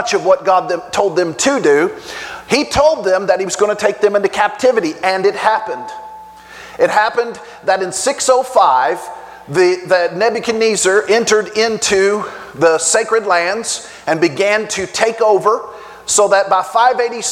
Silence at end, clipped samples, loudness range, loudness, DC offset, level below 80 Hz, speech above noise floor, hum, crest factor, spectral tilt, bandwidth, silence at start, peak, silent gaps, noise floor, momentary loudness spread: 0 s; under 0.1%; 3 LU; -14 LUFS; under 0.1%; -50 dBFS; 22 dB; none; 14 dB; -2.5 dB/octave; 15.5 kHz; 0 s; 0 dBFS; none; -35 dBFS; 11 LU